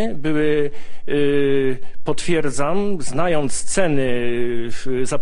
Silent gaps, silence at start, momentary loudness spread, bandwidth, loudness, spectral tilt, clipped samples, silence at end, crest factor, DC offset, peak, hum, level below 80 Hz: none; 0 s; 8 LU; 11 kHz; -21 LUFS; -5 dB/octave; under 0.1%; 0 s; 12 dB; under 0.1%; -2 dBFS; none; -42 dBFS